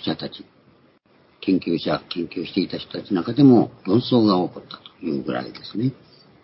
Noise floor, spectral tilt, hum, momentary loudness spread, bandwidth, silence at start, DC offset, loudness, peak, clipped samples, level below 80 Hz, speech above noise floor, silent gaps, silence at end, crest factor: -57 dBFS; -11.5 dB/octave; none; 16 LU; 5.8 kHz; 0 s; under 0.1%; -21 LUFS; -2 dBFS; under 0.1%; -58 dBFS; 36 dB; none; 0.5 s; 20 dB